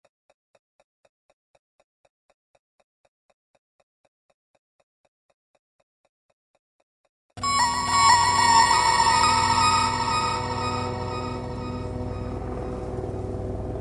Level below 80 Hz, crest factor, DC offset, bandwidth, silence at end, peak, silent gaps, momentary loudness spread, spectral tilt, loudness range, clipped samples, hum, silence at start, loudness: -44 dBFS; 22 dB; under 0.1%; 11.5 kHz; 0 s; -4 dBFS; none; 15 LU; -2.5 dB/octave; 11 LU; under 0.1%; none; 7.35 s; -22 LUFS